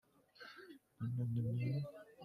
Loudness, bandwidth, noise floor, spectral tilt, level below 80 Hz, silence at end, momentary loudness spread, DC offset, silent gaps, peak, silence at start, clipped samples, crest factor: -42 LUFS; 5.4 kHz; -60 dBFS; -9 dB/octave; -74 dBFS; 0 s; 18 LU; under 0.1%; none; -30 dBFS; 0.4 s; under 0.1%; 14 dB